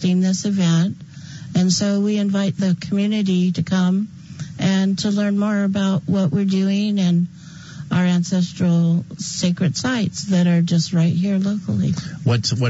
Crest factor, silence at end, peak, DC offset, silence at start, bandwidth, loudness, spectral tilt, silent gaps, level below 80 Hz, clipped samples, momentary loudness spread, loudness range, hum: 12 dB; 0 s; -6 dBFS; under 0.1%; 0 s; 8 kHz; -19 LUFS; -6 dB/octave; none; -58 dBFS; under 0.1%; 7 LU; 1 LU; none